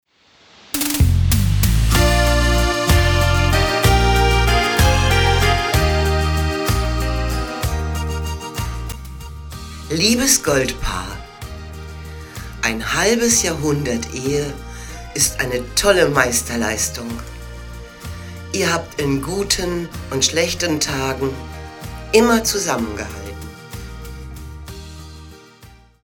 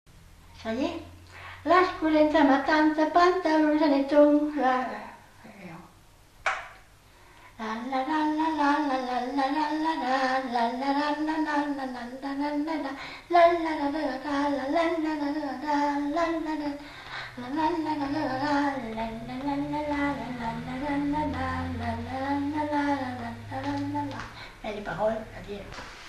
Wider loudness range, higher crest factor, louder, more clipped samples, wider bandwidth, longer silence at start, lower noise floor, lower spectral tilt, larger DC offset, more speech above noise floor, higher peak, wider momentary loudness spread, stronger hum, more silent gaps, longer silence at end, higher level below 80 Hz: about the same, 7 LU vs 8 LU; about the same, 18 dB vs 18 dB; first, -17 LUFS vs -27 LUFS; neither; first, over 20 kHz vs 12 kHz; first, 0.75 s vs 0.15 s; about the same, -52 dBFS vs -55 dBFS; second, -4 dB/octave vs -6 dB/octave; neither; first, 34 dB vs 28 dB; first, 0 dBFS vs -8 dBFS; first, 19 LU vs 16 LU; neither; neither; first, 0.3 s vs 0 s; first, -26 dBFS vs -54 dBFS